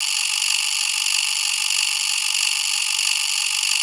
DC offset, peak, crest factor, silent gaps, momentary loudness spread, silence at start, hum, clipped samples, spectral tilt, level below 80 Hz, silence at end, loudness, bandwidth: under 0.1%; -4 dBFS; 18 dB; none; 1 LU; 0 s; none; under 0.1%; 10.5 dB/octave; under -90 dBFS; 0 s; -18 LUFS; 18.5 kHz